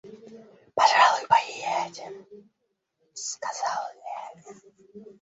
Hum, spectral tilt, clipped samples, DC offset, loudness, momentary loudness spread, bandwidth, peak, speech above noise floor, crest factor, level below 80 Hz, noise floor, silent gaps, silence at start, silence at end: none; -0.5 dB/octave; under 0.1%; under 0.1%; -24 LUFS; 24 LU; 8.2 kHz; -4 dBFS; 44 dB; 22 dB; -76 dBFS; -78 dBFS; none; 0.05 s; 0.1 s